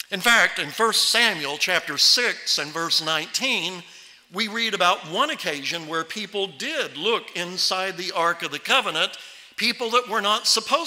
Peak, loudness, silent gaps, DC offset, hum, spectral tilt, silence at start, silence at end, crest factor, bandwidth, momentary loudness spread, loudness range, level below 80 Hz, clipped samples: -6 dBFS; -21 LUFS; none; under 0.1%; none; -1 dB/octave; 0.1 s; 0 s; 18 dB; 16 kHz; 11 LU; 5 LU; -70 dBFS; under 0.1%